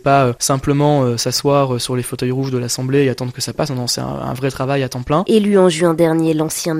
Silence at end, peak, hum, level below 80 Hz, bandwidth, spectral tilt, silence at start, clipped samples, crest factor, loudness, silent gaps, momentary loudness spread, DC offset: 0 s; 0 dBFS; none; -44 dBFS; 16 kHz; -5 dB/octave; 0.05 s; under 0.1%; 16 dB; -16 LUFS; none; 7 LU; under 0.1%